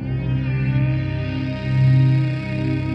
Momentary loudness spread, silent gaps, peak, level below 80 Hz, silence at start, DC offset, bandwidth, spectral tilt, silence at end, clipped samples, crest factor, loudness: 8 LU; none; -8 dBFS; -36 dBFS; 0 s; under 0.1%; 5.4 kHz; -9.5 dB/octave; 0 s; under 0.1%; 12 dB; -20 LUFS